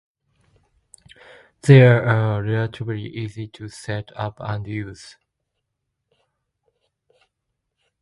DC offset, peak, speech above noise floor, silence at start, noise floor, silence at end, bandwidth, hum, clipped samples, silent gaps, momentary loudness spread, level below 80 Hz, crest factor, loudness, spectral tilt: under 0.1%; 0 dBFS; 59 dB; 1.65 s; -78 dBFS; 3.05 s; 11.5 kHz; none; under 0.1%; none; 23 LU; -54 dBFS; 22 dB; -19 LUFS; -7.5 dB/octave